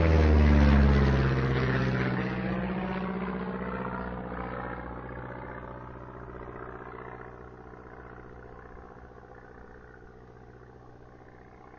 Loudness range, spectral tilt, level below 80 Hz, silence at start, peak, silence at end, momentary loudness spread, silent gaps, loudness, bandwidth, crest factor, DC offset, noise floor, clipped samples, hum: 22 LU; -8.5 dB/octave; -32 dBFS; 0 s; -10 dBFS; 0 s; 27 LU; none; -28 LUFS; 6.4 kHz; 18 dB; under 0.1%; -51 dBFS; under 0.1%; none